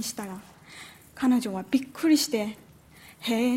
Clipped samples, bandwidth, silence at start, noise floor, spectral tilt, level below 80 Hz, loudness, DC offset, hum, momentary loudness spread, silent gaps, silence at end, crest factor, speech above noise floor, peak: under 0.1%; 16 kHz; 0 s; -52 dBFS; -3.5 dB/octave; -66 dBFS; -27 LUFS; under 0.1%; none; 22 LU; none; 0 s; 16 dB; 26 dB; -10 dBFS